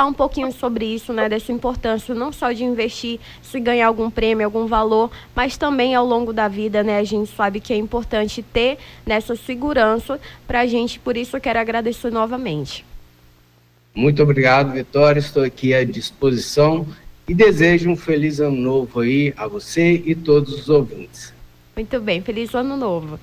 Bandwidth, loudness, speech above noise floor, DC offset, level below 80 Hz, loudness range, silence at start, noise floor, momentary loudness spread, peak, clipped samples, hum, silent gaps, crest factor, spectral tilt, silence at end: 16 kHz; -19 LUFS; 36 dB; under 0.1%; -40 dBFS; 5 LU; 0 s; -54 dBFS; 11 LU; -2 dBFS; under 0.1%; none; none; 16 dB; -6 dB/octave; 0.05 s